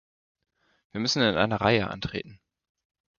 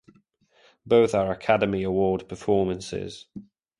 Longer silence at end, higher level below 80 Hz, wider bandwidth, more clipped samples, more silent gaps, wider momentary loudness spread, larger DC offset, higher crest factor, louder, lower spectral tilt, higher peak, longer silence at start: first, 0.85 s vs 0.4 s; about the same, -54 dBFS vs -52 dBFS; second, 7.2 kHz vs 11.5 kHz; neither; neither; second, 15 LU vs 18 LU; neither; about the same, 24 dB vs 20 dB; about the same, -25 LUFS vs -24 LUFS; second, -4.5 dB/octave vs -6.5 dB/octave; about the same, -4 dBFS vs -6 dBFS; about the same, 0.95 s vs 0.85 s